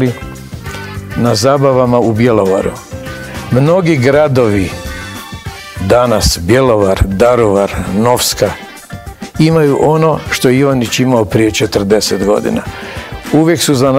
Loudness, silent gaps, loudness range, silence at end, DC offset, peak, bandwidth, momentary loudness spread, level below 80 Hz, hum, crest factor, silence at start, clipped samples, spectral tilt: -11 LUFS; none; 2 LU; 0 s; under 0.1%; 0 dBFS; 16.5 kHz; 16 LU; -30 dBFS; none; 12 dB; 0 s; 1%; -5.5 dB/octave